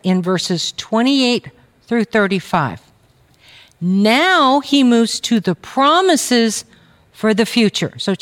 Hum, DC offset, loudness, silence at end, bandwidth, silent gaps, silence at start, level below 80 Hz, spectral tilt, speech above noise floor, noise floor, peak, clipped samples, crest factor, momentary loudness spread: none; under 0.1%; -15 LUFS; 0.05 s; 16.5 kHz; none; 0.05 s; -60 dBFS; -4.5 dB/octave; 38 dB; -53 dBFS; -2 dBFS; under 0.1%; 14 dB; 9 LU